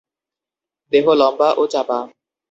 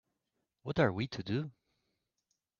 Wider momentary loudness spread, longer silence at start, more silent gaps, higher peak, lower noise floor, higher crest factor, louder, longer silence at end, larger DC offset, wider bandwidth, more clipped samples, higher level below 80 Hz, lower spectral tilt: second, 10 LU vs 14 LU; first, 0.9 s vs 0.65 s; neither; first, -2 dBFS vs -16 dBFS; about the same, -88 dBFS vs -85 dBFS; second, 16 dB vs 22 dB; first, -16 LUFS vs -35 LUFS; second, 0.45 s vs 1.1 s; neither; first, 8 kHz vs 7.2 kHz; neither; about the same, -66 dBFS vs -66 dBFS; about the same, -5 dB/octave vs -5.5 dB/octave